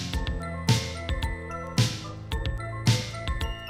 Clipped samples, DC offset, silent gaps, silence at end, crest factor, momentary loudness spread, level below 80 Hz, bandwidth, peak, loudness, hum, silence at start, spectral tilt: under 0.1%; under 0.1%; none; 0 s; 20 dB; 7 LU; -36 dBFS; 15.5 kHz; -10 dBFS; -29 LUFS; none; 0 s; -4.5 dB/octave